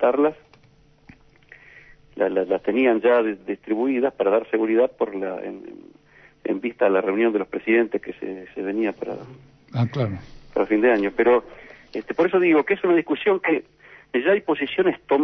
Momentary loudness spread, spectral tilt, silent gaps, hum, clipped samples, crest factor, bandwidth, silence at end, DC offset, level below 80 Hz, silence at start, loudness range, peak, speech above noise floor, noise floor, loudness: 14 LU; -8.5 dB/octave; none; none; under 0.1%; 14 dB; 6 kHz; 0 s; under 0.1%; -58 dBFS; 0 s; 4 LU; -8 dBFS; 34 dB; -55 dBFS; -22 LUFS